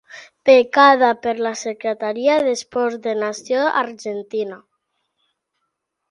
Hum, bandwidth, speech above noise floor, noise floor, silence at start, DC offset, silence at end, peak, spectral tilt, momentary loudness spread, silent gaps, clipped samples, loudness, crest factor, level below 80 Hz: none; 11 kHz; 58 dB; -76 dBFS; 0.15 s; under 0.1%; 1.55 s; 0 dBFS; -3 dB/octave; 13 LU; none; under 0.1%; -18 LUFS; 20 dB; -70 dBFS